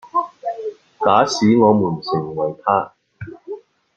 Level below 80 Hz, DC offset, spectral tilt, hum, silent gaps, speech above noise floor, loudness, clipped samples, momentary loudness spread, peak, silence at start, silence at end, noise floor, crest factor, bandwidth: -60 dBFS; under 0.1%; -6 dB/octave; none; none; 20 dB; -18 LUFS; under 0.1%; 21 LU; -2 dBFS; 0.05 s; 0.4 s; -36 dBFS; 18 dB; 7.8 kHz